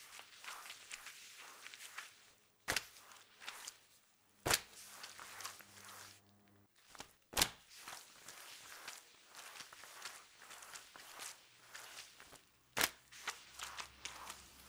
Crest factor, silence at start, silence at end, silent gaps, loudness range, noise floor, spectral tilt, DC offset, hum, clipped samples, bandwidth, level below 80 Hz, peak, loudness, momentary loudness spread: 40 dB; 0 s; 0 s; none; 9 LU; -71 dBFS; -0.5 dB/octave; under 0.1%; none; under 0.1%; over 20 kHz; -68 dBFS; -10 dBFS; -45 LUFS; 20 LU